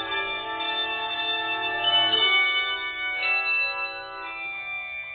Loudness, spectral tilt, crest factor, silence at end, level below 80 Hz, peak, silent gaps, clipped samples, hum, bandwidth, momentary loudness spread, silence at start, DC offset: -23 LUFS; -4.5 dB/octave; 16 dB; 0 s; -62 dBFS; -10 dBFS; none; under 0.1%; none; 4.7 kHz; 13 LU; 0 s; under 0.1%